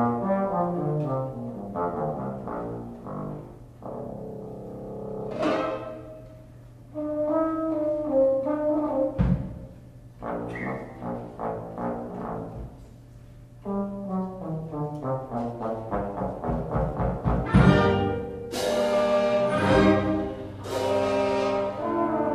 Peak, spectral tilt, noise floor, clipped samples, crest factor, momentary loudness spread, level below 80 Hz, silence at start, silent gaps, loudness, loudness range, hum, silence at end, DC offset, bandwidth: -6 dBFS; -7.5 dB/octave; -47 dBFS; under 0.1%; 22 dB; 16 LU; -42 dBFS; 0 s; none; -27 LUFS; 11 LU; none; 0 s; under 0.1%; 14.5 kHz